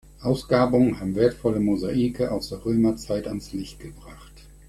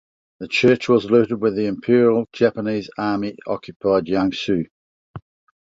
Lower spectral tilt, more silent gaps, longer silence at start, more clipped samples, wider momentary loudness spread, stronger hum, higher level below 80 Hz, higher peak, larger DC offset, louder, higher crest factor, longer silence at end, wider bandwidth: about the same, -7 dB/octave vs -6.5 dB/octave; second, none vs 3.76-3.80 s, 4.71-5.14 s; second, 0.2 s vs 0.4 s; neither; first, 14 LU vs 10 LU; neither; first, -46 dBFS vs -56 dBFS; second, -6 dBFS vs -2 dBFS; neither; second, -24 LUFS vs -19 LUFS; about the same, 18 dB vs 18 dB; second, 0.25 s vs 0.55 s; first, 14 kHz vs 7.8 kHz